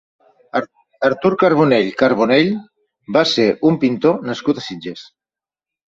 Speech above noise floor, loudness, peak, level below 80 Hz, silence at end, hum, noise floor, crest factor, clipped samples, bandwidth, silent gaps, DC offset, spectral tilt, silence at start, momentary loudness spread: over 74 dB; -16 LUFS; 0 dBFS; -58 dBFS; 0.9 s; none; under -90 dBFS; 16 dB; under 0.1%; 7.8 kHz; none; under 0.1%; -6 dB/octave; 0.55 s; 14 LU